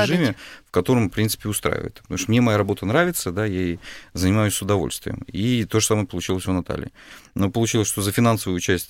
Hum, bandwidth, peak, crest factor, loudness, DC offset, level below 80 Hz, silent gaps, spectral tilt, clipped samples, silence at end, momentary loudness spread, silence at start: none; 16.5 kHz; -6 dBFS; 16 dB; -22 LUFS; under 0.1%; -46 dBFS; none; -5 dB/octave; under 0.1%; 0.05 s; 10 LU; 0 s